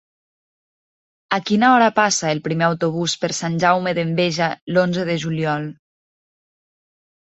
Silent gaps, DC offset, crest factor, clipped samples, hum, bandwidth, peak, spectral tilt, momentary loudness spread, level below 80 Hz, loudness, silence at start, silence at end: 4.61-4.67 s; under 0.1%; 20 dB; under 0.1%; none; 8.2 kHz; -2 dBFS; -4.5 dB/octave; 8 LU; -62 dBFS; -19 LUFS; 1.3 s; 1.5 s